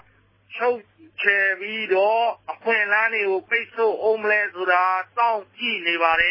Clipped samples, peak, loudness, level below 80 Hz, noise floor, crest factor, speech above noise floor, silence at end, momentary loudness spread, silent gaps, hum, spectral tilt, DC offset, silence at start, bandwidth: under 0.1%; -4 dBFS; -21 LUFS; -62 dBFS; -58 dBFS; 18 dB; 36 dB; 0 s; 7 LU; none; none; -5 dB/octave; under 0.1%; 0.5 s; 5.8 kHz